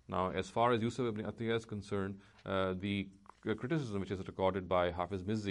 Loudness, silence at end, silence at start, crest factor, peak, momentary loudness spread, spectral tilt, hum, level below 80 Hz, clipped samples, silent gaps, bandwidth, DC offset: -37 LUFS; 0 s; 0.1 s; 18 dB; -18 dBFS; 8 LU; -6.5 dB/octave; none; -64 dBFS; under 0.1%; none; 11 kHz; under 0.1%